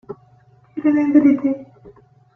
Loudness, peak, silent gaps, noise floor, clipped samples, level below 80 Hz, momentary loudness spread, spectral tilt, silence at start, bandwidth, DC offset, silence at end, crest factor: -17 LUFS; -2 dBFS; none; -52 dBFS; under 0.1%; -60 dBFS; 23 LU; -9 dB/octave; 0.1 s; 3 kHz; under 0.1%; 0.45 s; 16 dB